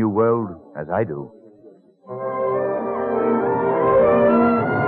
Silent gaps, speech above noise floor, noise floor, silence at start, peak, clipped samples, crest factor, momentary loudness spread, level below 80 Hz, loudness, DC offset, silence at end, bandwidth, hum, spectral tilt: none; 26 dB; -48 dBFS; 0 s; -6 dBFS; under 0.1%; 14 dB; 16 LU; -52 dBFS; -19 LUFS; under 0.1%; 0 s; 4.4 kHz; none; -11.5 dB/octave